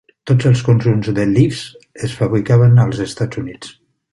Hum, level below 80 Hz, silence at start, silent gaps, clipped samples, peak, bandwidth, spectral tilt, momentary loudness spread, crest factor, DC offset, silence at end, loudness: none; -44 dBFS; 0.25 s; none; under 0.1%; -2 dBFS; 11.5 kHz; -7.5 dB/octave; 17 LU; 14 dB; under 0.1%; 0.4 s; -15 LUFS